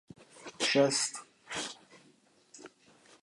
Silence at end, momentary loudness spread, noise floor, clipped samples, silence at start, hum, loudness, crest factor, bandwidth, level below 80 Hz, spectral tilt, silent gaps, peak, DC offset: 0.55 s; 26 LU; -65 dBFS; under 0.1%; 0.2 s; none; -31 LUFS; 22 dB; 11.5 kHz; -78 dBFS; -2.5 dB/octave; none; -14 dBFS; under 0.1%